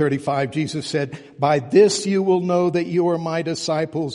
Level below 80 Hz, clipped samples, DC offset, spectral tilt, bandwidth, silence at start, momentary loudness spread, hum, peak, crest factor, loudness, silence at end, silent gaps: -62 dBFS; under 0.1%; under 0.1%; -5.5 dB/octave; 11.5 kHz; 0 s; 9 LU; none; -2 dBFS; 16 dB; -20 LUFS; 0 s; none